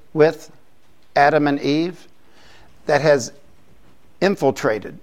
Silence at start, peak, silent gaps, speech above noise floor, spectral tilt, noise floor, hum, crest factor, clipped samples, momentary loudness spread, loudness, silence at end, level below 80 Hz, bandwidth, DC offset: 0.15 s; -2 dBFS; none; 40 dB; -5.5 dB/octave; -58 dBFS; none; 18 dB; under 0.1%; 12 LU; -19 LUFS; 0.05 s; -58 dBFS; 15.5 kHz; 0.7%